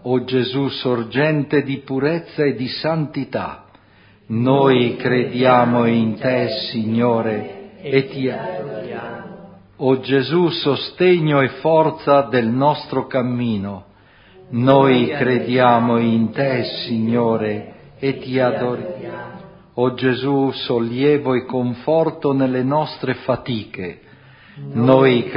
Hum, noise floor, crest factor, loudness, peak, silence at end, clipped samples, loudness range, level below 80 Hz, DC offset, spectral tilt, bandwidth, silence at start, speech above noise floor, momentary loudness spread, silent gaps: none; -50 dBFS; 18 dB; -18 LUFS; 0 dBFS; 0 s; under 0.1%; 5 LU; -56 dBFS; under 0.1%; -10.5 dB/octave; 5.4 kHz; 0.05 s; 33 dB; 14 LU; none